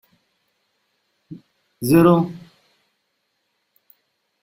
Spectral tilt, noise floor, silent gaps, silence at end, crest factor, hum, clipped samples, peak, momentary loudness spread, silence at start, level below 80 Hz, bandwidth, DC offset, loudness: -7.5 dB/octave; -72 dBFS; none; 2.05 s; 22 dB; none; under 0.1%; -2 dBFS; 29 LU; 1.3 s; -56 dBFS; 16 kHz; under 0.1%; -17 LUFS